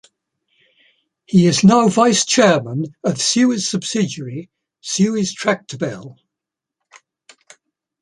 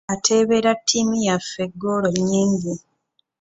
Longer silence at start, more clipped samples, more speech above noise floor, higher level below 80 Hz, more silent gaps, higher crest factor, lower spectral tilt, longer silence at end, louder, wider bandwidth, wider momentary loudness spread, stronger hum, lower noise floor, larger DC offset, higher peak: first, 1.3 s vs 0.1 s; neither; first, 68 dB vs 49 dB; about the same, -58 dBFS vs -56 dBFS; neither; about the same, 16 dB vs 18 dB; about the same, -4.5 dB/octave vs -4 dB/octave; first, 1.9 s vs 0.65 s; first, -16 LUFS vs -20 LUFS; first, 11.5 kHz vs 8.2 kHz; first, 15 LU vs 10 LU; neither; first, -84 dBFS vs -69 dBFS; neither; about the same, -2 dBFS vs -2 dBFS